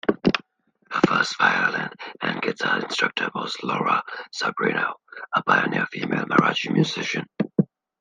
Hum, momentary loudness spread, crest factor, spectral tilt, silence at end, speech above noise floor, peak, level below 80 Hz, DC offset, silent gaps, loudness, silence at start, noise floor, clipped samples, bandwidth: none; 9 LU; 22 dB; -5 dB/octave; 0.35 s; 39 dB; -2 dBFS; -64 dBFS; under 0.1%; none; -23 LUFS; 0.05 s; -62 dBFS; under 0.1%; 9.6 kHz